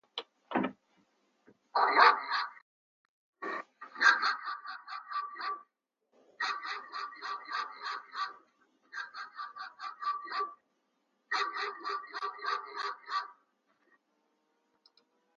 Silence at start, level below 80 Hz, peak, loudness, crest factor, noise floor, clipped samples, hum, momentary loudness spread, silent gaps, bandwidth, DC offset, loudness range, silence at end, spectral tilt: 0.15 s; under -90 dBFS; -8 dBFS; -33 LUFS; 28 dB; -80 dBFS; under 0.1%; none; 18 LU; 2.62-3.33 s; 7.4 kHz; under 0.1%; 11 LU; 2.05 s; 1 dB/octave